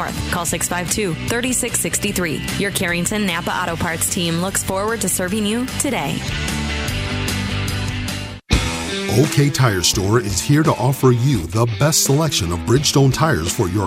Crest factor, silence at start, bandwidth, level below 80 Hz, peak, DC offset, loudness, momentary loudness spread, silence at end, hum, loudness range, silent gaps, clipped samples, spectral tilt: 18 dB; 0 s; 16 kHz; -34 dBFS; 0 dBFS; under 0.1%; -18 LUFS; 7 LU; 0 s; none; 5 LU; none; under 0.1%; -4 dB/octave